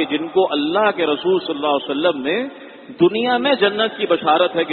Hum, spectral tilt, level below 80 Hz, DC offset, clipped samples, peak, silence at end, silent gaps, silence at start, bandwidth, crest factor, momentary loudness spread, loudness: none; -10 dB/octave; -64 dBFS; under 0.1%; under 0.1%; -2 dBFS; 0 s; none; 0 s; 4.4 kHz; 16 dB; 6 LU; -18 LUFS